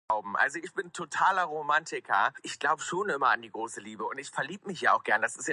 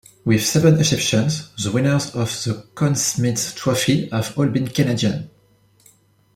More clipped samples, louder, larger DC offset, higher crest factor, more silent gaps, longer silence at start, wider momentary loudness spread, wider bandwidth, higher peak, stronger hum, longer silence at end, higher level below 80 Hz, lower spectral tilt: neither; second, -29 LUFS vs -19 LUFS; neither; about the same, 20 dB vs 18 dB; neither; second, 0.1 s vs 0.25 s; about the same, 11 LU vs 9 LU; second, 11.5 kHz vs 16 kHz; second, -10 dBFS vs -2 dBFS; neither; second, 0 s vs 1.05 s; second, -78 dBFS vs -52 dBFS; second, -2.5 dB/octave vs -4.5 dB/octave